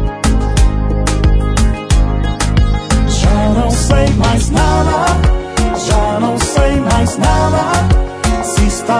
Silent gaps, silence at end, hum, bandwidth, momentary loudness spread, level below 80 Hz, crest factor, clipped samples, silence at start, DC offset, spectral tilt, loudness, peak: none; 0 s; none; 11 kHz; 3 LU; -14 dBFS; 10 dB; under 0.1%; 0 s; under 0.1%; -5.5 dB/octave; -13 LUFS; 0 dBFS